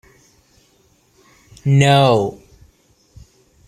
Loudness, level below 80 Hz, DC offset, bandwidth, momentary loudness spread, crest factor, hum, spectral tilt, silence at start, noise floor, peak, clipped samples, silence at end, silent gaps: -15 LUFS; -52 dBFS; under 0.1%; 10.5 kHz; 14 LU; 18 dB; none; -6 dB/octave; 1.65 s; -57 dBFS; -2 dBFS; under 0.1%; 1.35 s; none